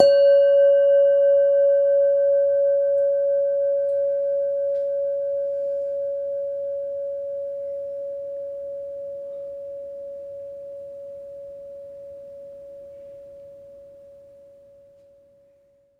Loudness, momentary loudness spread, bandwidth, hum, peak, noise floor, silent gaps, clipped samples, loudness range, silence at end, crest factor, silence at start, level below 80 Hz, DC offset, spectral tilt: -21 LUFS; 24 LU; 4.7 kHz; none; 0 dBFS; -60 dBFS; none; under 0.1%; 23 LU; 1.85 s; 22 dB; 0 s; -68 dBFS; under 0.1%; -4 dB/octave